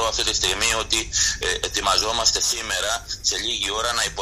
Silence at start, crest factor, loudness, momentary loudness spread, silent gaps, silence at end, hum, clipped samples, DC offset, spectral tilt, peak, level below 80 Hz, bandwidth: 0 s; 18 dB; -20 LUFS; 5 LU; none; 0 s; none; under 0.1%; under 0.1%; 0 dB/octave; -4 dBFS; -38 dBFS; 15.5 kHz